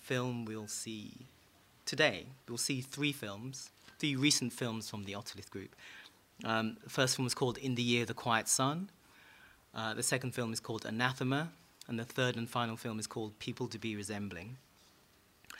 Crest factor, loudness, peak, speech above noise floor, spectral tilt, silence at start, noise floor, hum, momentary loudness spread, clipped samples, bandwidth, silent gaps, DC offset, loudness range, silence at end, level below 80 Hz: 26 dB; -36 LUFS; -12 dBFS; 30 dB; -3.5 dB/octave; 0 s; -66 dBFS; none; 17 LU; under 0.1%; 16 kHz; none; under 0.1%; 4 LU; 0 s; -74 dBFS